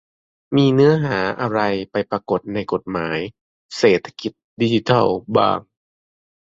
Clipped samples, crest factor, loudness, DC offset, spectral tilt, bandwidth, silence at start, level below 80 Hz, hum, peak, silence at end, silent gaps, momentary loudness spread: under 0.1%; 18 dB; -19 LUFS; under 0.1%; -6.5 dB/octave; 7.8 kHz; 0.5 s; -54 dBFS; none; -2 dBFS; 0.85 s; 3.41-3.69 s, 4.44-4.57 s; 11 LU